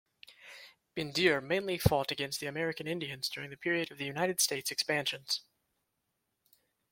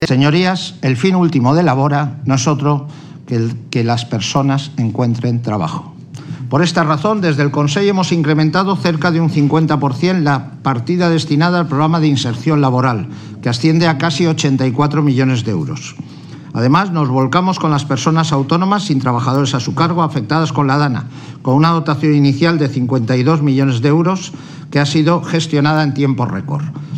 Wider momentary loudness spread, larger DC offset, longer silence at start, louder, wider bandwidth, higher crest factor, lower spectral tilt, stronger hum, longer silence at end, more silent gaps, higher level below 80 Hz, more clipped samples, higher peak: first, 14 LU vs 8 LU; neither; first, 0.3 s vs 0 s; second, -32 LUFS vs -14 LUFS; first, 16.5 kHz vs 9.4 kHz; first, 28 dB vs 14 dB; second, -3.5 dB/octave vs -6.5 dB/octave; neither; first, 1.5 s vs 0 s; neither; about the same, -58 dBFS vs -54 dBFS; neither; second, -8 dBFS vs 0 dBFS